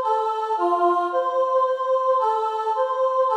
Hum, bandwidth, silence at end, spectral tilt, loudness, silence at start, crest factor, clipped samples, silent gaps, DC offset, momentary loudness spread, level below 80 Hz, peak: none; 8.6 kHz; 0 s; -3 dB/octave; -22 LUFS; 0 s; 14 dB; under 0.1%; none; under 0.1%; 3 LU; -80 dBFS; -8 dBFS